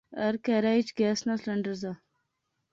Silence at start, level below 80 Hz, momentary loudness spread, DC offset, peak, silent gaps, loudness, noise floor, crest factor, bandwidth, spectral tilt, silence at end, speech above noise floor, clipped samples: 0.1 s; -70 dBFS; 12 LU; under 0.1%; -14 dBFS; none; -29 LUFS; -80 dBFS; 16 dB; 7.6 kHz; -5.5 dB/octave; 0.8 s; 52 dB; under 0.1%